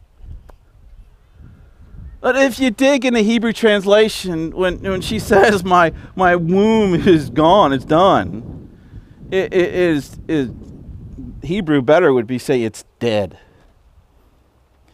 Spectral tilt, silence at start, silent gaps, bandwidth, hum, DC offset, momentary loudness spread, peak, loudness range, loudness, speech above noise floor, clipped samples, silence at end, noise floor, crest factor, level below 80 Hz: -5.5 dB/octave; 0.25 s; none; 16 kHz; none; under 0.1%; 15 LU; 0 dBFS; 6 LU; -15 LUFS; 39 dB; under 0.1%; 1.65 s; -54 dBFS; 16 dB; -40 dBFS